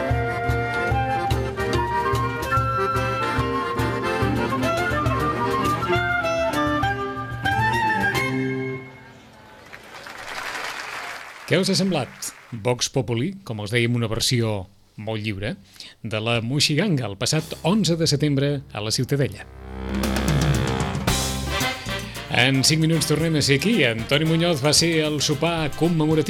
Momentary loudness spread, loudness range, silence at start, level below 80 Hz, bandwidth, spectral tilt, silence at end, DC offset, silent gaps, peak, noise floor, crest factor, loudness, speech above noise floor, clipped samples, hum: 12 LU; 6 LU; 0 s; -38 dBFS; 17.5 kHz; -4.5 dB/octave; 0 s; under 0.1%; none; -4 dBFS; -46 dBFS; 18 dB; -22 LUFS; 24 dB; under 0.1%; none